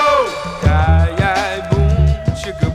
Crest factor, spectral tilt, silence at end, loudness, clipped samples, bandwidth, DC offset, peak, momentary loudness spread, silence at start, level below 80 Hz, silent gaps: 14 dB; -6.5 dB/octave; 0 s; -16 LUFS; under 0.1%; 11 kHz; under 0.1%; 0 dBFS; 7 LU; 0 s; -20 dBFS; none